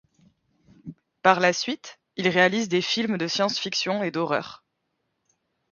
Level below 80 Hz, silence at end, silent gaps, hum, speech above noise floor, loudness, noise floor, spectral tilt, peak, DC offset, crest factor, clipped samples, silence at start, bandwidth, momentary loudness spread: -70 dBFS; 1.15 s; none; none; 53 dB; -23 LUFS; -77 dBFS; -4 dB/octave; -2 dBFS; under 0.1%; 24 dB; under 0.1%; 0.85 s; 7.4 kHz; 19 LU